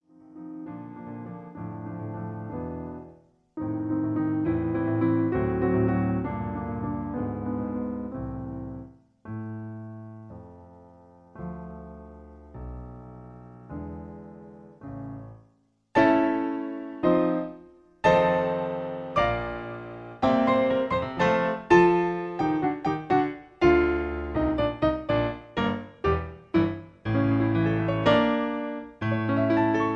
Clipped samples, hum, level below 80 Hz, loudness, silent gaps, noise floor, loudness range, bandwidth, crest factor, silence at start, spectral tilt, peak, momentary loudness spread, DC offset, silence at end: under 0.1%; none; -46 dBFS; -26 LUFS; none; -65 dBFS; 18 LU; 7 kHz; 22 dB; 0.3 s; -8 dB/octave; -6 dBFS; 21 LU; under 0.1%; 0 s